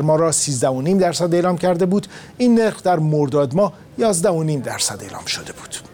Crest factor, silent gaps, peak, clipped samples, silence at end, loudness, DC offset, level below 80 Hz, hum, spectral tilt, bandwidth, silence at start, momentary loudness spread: 12 dB; none; -6 dBFS; under 0.1%; 0.1 s; -18 LUFS; under 0.1%; -54 dBFS; none; -5 dB/octave; 18 kHz; 0 s; 9 LU